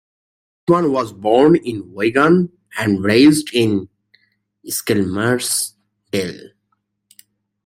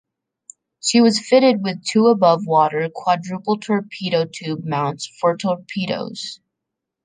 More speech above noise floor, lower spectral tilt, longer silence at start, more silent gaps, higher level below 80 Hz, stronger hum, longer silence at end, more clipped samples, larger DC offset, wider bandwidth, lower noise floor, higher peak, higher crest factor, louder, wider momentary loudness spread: second, 54 dB vs 63 dB; about the same, -5 dB/octave vs -5 dB/octave; second, 0.7 s vs 0.85 s; neither; first, -56 dBFS vs -68 dBFS; neither; first, 1.2 s vs 0.7 s; neither; neither; first, 16.5 kHz vs 9.8 kHz; second, -70 dBFS vs -82 dBFS; about the same, 0 dBFS vs -2 dBFS; about the same, 16 dB vs 18 dB; about the same, -17 LUFS vs -19 LUFS; about the same, 13 LU vs 11 LU